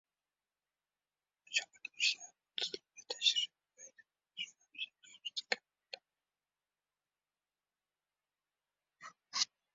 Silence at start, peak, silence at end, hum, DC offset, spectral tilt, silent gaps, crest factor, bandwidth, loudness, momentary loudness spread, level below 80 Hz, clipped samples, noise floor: 1.5 s; -14 dBFS; 0.3 s; 50 Hz at -95 dBFS; under 0.1%; 4.5 dB/octave; none; 30 dB; 7.6 kHz; -38 LUFS; 24 LU; under -90 dBFS; under 0.1%; under -90 dBFS